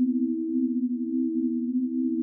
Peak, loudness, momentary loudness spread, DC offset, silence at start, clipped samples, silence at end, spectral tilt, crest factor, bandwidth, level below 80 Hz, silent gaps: -16 dBFS; -27 LUFS; 1 LU; under 0.1%; 0 s; under 0.1%; 0 s; -15.5 dB/octave; 10 dB; 0.5 kHz; under -90 dBFS; none